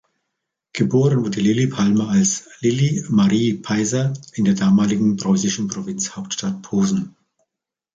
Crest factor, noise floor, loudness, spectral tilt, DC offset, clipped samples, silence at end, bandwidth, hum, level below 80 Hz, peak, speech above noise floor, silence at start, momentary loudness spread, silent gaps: 14 dB; -84 dBFS; -19 LUFS; -5.5 dB/octave; under 0.1%; under 0.1%; 0.85 s; 9 kHz; none; -56 dBFS; -4 dBFS; 66 dB; 0.75 s; 9 LU; none